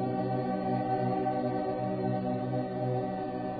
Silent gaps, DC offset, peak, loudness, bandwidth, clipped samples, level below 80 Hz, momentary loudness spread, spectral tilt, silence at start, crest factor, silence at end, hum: none; under 0.1%; -18 dBFS; -32 LUFS; 4.8 kHz; under 0.1%; -60 dBFS; 3 LU; -8 dB/octave; 0 s; 12 dB; 0 s; none